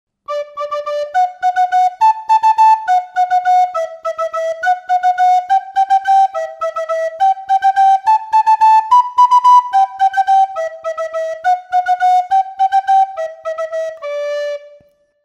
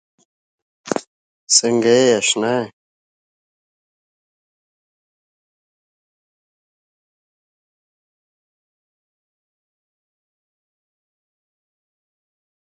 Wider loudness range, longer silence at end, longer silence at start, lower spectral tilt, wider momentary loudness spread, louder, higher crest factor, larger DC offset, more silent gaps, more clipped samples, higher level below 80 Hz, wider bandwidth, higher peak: second, 5 LU vs 8 LU; second, 0.55 s vs 10 s; second, 0.3 s vs 0.85 s; second, 0.5 dB/octave vs -2.5 dB/octave; about the same, 12 LU vs 12 LU; about the same, -14 LUFS vs -16 LUFS; second, 12 dB vs 26 dB; neither; second, none vs 1.07-1.47 s; neither; about the same, -68 dBFS vs -72 dBFS; about the same, 9.4 kHz vs 9.6 kHz; about the same, -2 dBFS vs 0 dBFS